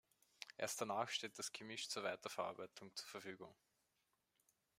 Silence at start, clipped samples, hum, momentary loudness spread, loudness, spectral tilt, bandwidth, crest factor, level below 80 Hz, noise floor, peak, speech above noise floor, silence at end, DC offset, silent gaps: 0.4 s; under 0.1%; none; 13 LU; -47 LUFS; -2 dB/octave; 16 kHz; 24 dB; under -90 dBFS; -86 dBFS; -26 dBFS; 38 dB; 1.25 s; under 0.1%; none